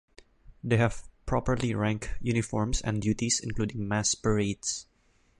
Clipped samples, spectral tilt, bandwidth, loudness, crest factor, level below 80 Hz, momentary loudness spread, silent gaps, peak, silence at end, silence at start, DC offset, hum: under 0.1%; -4.5 dB/octave; 11.5 kHz; -29 LUFS; 20 dB; -44 dBFS; 7 LU; none; -10 dBFS; 0.55 s; 0.2 s; under 0.1%; none